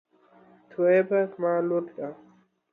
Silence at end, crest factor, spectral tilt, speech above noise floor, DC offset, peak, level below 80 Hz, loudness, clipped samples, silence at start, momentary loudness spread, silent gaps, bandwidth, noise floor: 0.6 s; 16 dB; -10 dB/octave; 33 dB; under 0.1%; -12 dBFS; -80 dBFS; -25 LUFS; under 0.1%; 0.8 s; 16 LU; none; 4 kHz; -57 dBFS